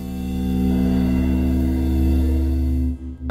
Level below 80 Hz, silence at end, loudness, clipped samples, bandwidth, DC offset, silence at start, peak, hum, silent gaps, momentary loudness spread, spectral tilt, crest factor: -24 dBFS; 0 s; -21 LUFS; under 0.1%; 15 kHz; under 0.1%; 0 s; -8 dBFS; none; none; 6 LU; -8.5 dB/octave; 10 dB